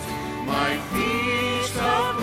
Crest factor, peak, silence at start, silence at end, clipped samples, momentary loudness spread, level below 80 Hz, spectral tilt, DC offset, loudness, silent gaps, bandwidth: 14 dB; -10 dBFS; 0 s; 0 s; under 0.1%; 5 LU; -46 dBFS; -4 dB/octave; under 0.1%; -24 LUFS; none; 16.5 kHz